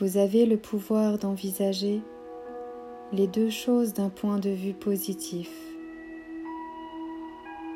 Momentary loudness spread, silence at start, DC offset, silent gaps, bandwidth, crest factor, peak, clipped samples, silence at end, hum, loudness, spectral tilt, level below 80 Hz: 17 LU; 0 s; under 0.1%; none; 16 kHz; 16 dB; -12 dBFS; under 0.1%; 0 s; none; -28 LUFS; -6 dB/octave; -66 dBFS